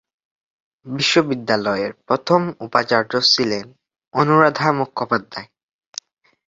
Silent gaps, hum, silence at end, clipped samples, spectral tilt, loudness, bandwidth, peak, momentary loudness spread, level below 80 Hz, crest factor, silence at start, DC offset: 4.07-4.11 s; none; 1.05 s; under 0.1%; -4.5 dB/octave; -18 LUFS; 7.8 kHz; 0 dBFS; 19 LU; -62 dBFS; 20 dB; 0.85 s; under 0.1%